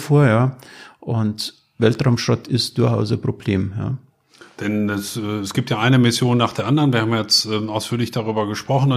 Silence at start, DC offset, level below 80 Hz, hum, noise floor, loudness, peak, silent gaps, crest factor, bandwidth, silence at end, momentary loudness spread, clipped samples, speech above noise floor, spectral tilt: 0 s; under 0.1%; -54 dBFS; none; -48 dBFS; -19 LUFS; -2 dBFS; none; 18 dB; 15.5 kHz; 0 s; 10 LU; under 0.1%; 30 dB; -5.5 dB/octave